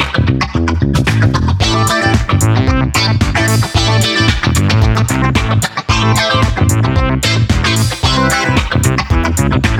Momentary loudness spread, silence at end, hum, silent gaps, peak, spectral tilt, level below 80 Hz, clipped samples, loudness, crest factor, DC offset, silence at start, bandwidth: 2 LU; 0 s; none; none; 0 dBFS; -5 dB/octave; -22 dBFS; under 0.1%; -12 LUFS; 12 dB; under 0.1%; 0 s; 17 kHz